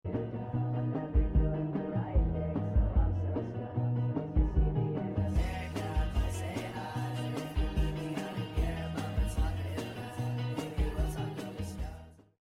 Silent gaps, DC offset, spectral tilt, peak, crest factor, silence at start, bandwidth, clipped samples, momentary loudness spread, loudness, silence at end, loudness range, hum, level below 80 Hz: none; under 0.1%; -7.5 dB/octave; -18 dBFS; 14 dB; 0.05 s; 13.5 kHz; under 0.1%; 7 LU; -34 LUFS; 0.35 s; 3 LU; none; -34 dBFS